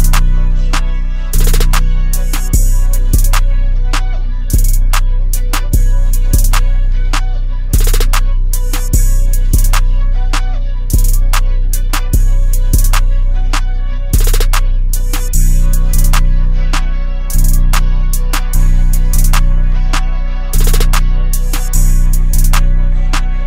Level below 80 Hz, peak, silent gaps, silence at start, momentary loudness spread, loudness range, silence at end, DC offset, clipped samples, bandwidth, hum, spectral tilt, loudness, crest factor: -8 dBFS; 0 dBFS; none; 0 s; 5 LU; 0 LU; 0 s; under 0.1%; under 0.1%; 16.5 kHz; none; -4 dB/octave; -15 LUFS; 8 dB